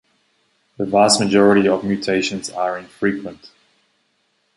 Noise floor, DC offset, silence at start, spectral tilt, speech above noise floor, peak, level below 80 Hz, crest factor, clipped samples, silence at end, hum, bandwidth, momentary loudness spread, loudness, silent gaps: -66 dBFS; under 0.1%; 0.8 s; -4 dB/octave; 49 dB; -2 dBFS; -56 dBFS; 18 dB; under 0.1%; 1.1 s; none; 11.5 kHz; 12 LU; -17 LUFS; none